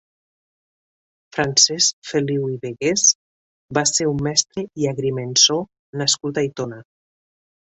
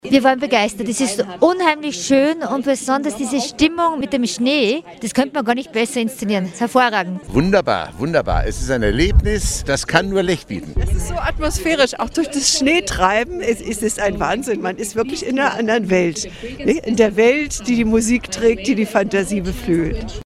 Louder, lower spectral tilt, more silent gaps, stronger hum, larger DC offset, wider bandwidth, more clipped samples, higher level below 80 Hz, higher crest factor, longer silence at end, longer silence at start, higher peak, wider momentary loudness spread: about the same, -18 LUFS vs -18 LUFS; second, -2.5 dB/octave vs -4 dB/octave; first, 1.93-2.02 s, 3.15-3.68 s, 5.79-5.93 s vs none; neither; neither; second, 8.4 kHz vs 15.5 kHz; neither; second, -56 dBFS vs -28 dBFS; about the same, 22 dB vs 18 dB; first, 0.9 s vs 0.05 s; first, 1.35 s vs 0.05 s; about the same, 0 dBFS vs 0 dBFS; first, 12 LU vs 7 LU